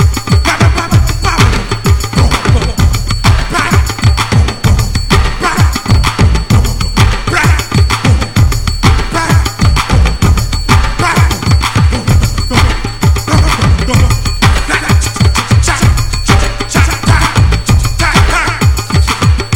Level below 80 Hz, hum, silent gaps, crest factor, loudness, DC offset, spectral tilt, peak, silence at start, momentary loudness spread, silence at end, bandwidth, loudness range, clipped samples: -14 dBFS; none; none; 8 dB; -10 LUFS; under 0.1%; -4.5 dB/octave; 0 dBFS; 0 s; 3 LU; 0 s; 17.5 kHz; 1 LU; 0.4%